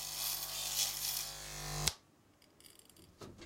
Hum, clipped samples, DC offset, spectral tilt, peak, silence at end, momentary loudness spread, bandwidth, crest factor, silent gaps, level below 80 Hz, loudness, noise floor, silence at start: none; under 0.1%; under 0.1%; -1 dB/octave; -8 dBFS; 0 s; 21 LU; 16.5 kHz; 34 dB; none; -58 dBFS; -37 LUFS; -67 dBFS; 0 s